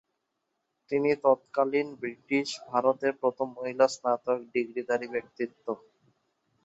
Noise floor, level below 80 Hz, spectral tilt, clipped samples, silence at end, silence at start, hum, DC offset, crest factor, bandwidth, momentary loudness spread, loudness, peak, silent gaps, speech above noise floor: -81 dBFS; -76 dBFS; -4.5 dB/octave; under 0.1%; 0.9 s; 0.9 s; none; under 0.1%; 22 dB; 8 kHz; 10 LU; -29 LUFS; -8 dBFS; none; 52 dB